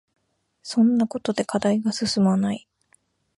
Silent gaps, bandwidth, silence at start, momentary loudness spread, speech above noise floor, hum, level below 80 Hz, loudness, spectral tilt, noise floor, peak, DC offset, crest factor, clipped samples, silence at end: none; 11.5 kHz; 0.65 s; 8 LU; 43 dB; none; -62 dBFS; -22 LUFS; -5.5 dB/octave; -64 dBFS; -8 dBFS; under 0.1%; 16 dB; under 0.1%; 0.8 s